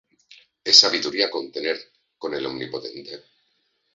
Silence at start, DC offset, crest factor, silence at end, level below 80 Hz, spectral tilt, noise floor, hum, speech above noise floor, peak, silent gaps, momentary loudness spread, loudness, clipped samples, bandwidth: 0.65 s; under 0.1%; 24 dB; 0.75 s; -68 dBFS; -1 dB/octave; -70 dBFS; none; 48 dB; 0 dBFS; none; 23 LU; -19 LUFS; under 0.1%; 8 kHz